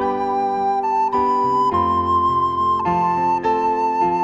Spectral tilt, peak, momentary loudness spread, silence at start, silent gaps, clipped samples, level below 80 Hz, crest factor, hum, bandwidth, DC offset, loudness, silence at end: -7 dB/octave; -8 dBFS; 3 LU; 0 s; none; under 0.1%; -48 dBFS; 10 dB; none; 7.8 kHz; under 0.1%; -18 LUFS; 0 s